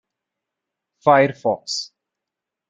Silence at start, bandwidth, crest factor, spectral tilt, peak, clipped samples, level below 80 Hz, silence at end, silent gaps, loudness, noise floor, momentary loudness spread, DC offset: 1.05 s; 9.2 kHz; 22 dB; -4.5 dB/octave; -2 dBFS; under 0.1%; -68 dBFS; 0.85 s; none; -19 LUFS; -85 dBFS; 12 LU; under 0.1%